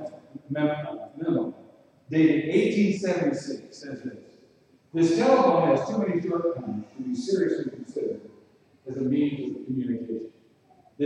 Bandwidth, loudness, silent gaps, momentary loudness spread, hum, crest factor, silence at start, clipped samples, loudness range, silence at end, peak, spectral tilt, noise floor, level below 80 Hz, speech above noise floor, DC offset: 9.8 kHz; -26 LUFS; none; 17 LU; none; 18 dB; 0 s; under 0.1%; 5 LU; 0 s; -8 dBFS; -7 dB/octave; -59 dBFS; -70 dBFS; 34 dB; under 0.1%